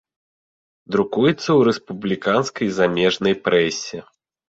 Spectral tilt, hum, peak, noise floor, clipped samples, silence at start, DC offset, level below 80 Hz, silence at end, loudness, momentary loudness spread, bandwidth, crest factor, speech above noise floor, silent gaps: -5 dB/octave; none; -2 dBFS; under -90 dBFS; under 0.1%; 0.9 s; under 0.1%; -58 dBFS; 0.5 s; -19 LUFS; 9 LU; 8 kHz; 18 dB; over 71 dB; none